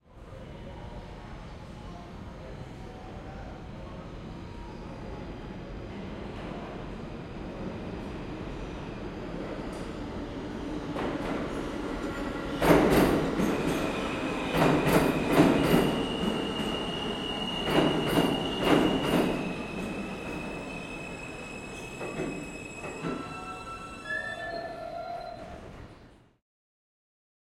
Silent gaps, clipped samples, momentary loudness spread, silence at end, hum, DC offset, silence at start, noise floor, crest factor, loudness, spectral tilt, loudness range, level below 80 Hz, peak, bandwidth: none; under 0.1%; 19 LU; 1.25 s; none; under 0.1%; 0.1 s; -54 dBFS; 24 dB; -30 LUFS; -5.5 dB/octave; 16 LU; -46 dBFS; -8 dBFS; 16.5 kHz